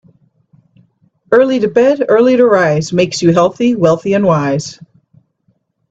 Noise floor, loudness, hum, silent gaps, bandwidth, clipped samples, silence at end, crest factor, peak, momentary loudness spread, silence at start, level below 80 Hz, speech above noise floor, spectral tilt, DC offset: -61 dBFS; -11 LUFS; none; none; 8 kHz; under 0.1%; 1.15 s; 14 dB; 0 dBFS; 5 LU; 1.3 s; -52 dBFS; 50 dB; -6 dB/octave; under 0.1%